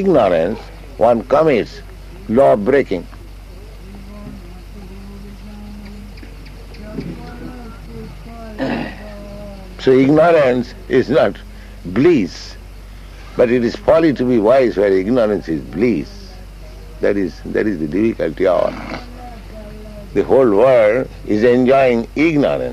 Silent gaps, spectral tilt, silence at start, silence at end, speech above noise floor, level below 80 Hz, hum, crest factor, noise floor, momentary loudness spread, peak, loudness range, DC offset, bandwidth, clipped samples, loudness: none; -7.5 dB/octave; 0 s; 0 s; 20 dB; -36 dBFS; none; 16 dB; -34 dBFS; 24 LU; -2 dBFS; 18 LU; under 0.1%; 13.5 kHz; under 0.1%; -15 LUFS